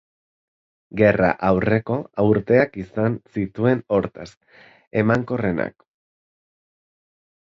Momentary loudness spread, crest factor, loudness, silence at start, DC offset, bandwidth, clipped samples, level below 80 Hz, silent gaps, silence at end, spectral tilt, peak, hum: 12 LU; 20 dB; -21 LUFS; 0.95 s; under 0.1%; 7.6 kHz; under 0.1%; -50 dBFS; 4.37-4.41 s, 4.87-4.91 s; 1.85 s; -9 dB/octave; -2 dBFS; none